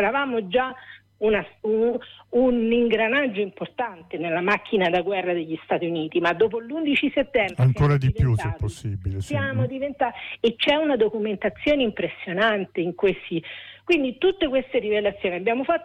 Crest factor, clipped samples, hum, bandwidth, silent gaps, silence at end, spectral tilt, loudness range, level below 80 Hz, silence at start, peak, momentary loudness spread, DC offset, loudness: 14 dB; under 0.1%; none; 10.5 kHz; none; 0 s; -7 dB/octave; 2 LU; -44 dBFS; 0 s; -8 dBFS; 9 LU; under 0.1%; -23 LUFS